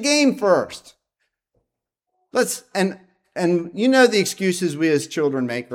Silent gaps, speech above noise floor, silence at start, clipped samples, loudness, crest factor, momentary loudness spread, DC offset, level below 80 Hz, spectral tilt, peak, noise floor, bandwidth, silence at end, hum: none; 62 dB; 0 s; under 0.1%; -20 LUFS; 20 dB; 10 LU; under 0.1%; -70 dBFS; -4 dB/octave; -2 dBFS; -81 dBFS; 17 kHz; 0 s; none